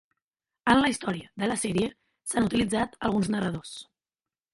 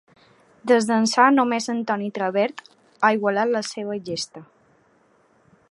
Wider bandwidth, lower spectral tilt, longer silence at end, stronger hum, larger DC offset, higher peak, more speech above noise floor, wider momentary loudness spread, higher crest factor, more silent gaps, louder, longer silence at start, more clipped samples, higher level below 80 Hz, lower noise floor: about the same, 11.5 kHz vs 11.5 kHz; about the same, -4.5 dB/octave vs -4 dB/octave; second, 0.7 s vs 1.3 s; neither; neither; second, -6 dBFS vs -2 dBFS; first, over 63 dB vs 39 dB; about the same, 13 LU vs 13 LU; about the same, 24 dB vs 20 dB; neither; second, -27 LUFS vs -21 LUFS; about the same, 0.65 s vs 0.65 s; neither; first, -54 dBFS vs -72 dBFS; first, under -90 dBFS vs -60 dBFS